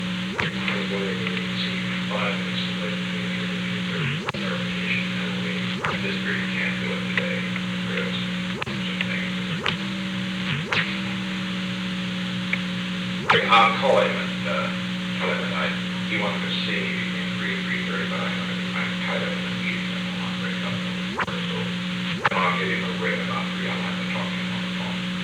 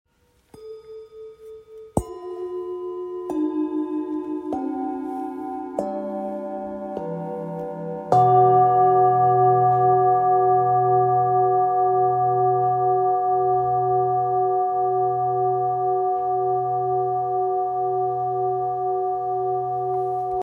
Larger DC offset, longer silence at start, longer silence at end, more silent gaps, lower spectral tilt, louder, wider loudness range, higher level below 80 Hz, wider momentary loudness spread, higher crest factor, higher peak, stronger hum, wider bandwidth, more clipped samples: neither; second, 0 s vs 0.55 s; about the same, 0 s vs 0 s; neither; second, -5 dB/octave vs -9 dB/octave; second, -25 LUFS vs -22 LUFS; second, 5 LU vs 11 LU; about the same, -56 dBFS vs -56 dBFS; second, 5 LU vs 14 LU; about the same, 20 dB vs 18 dB; about the same, -4 dBFS vs -2 dBFS; neither; first, 11.5 kHz vs 9.4 kHz; neither